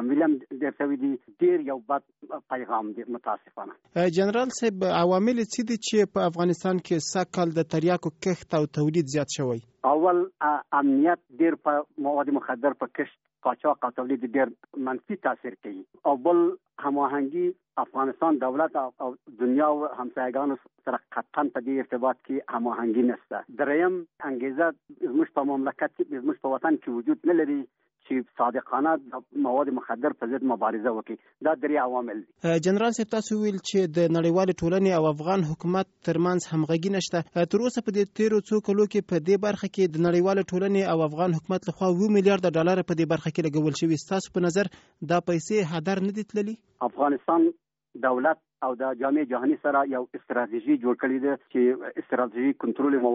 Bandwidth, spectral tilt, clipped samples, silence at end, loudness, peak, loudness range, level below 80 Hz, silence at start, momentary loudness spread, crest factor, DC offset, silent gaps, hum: 8 kHz; -6 dB/octave; under 0.1%; 0 s; -26 LUFS; -8 dBFS; 3 LU; -66 dBFS; 0 s; 9 LU; 18 dB; under 0.1%; none; none